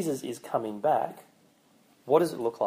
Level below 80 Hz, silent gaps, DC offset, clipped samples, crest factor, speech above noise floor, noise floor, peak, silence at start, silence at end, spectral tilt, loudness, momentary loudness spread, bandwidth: -78 dBFS; none; under 0.1%; under 0.1%; 20 dB; 35 dB; -63 dBFS; -8 dBFS; 0 s; 0 s; -5.5 dB/octave; -28 LUFS; 9 LU; 15.5 kHz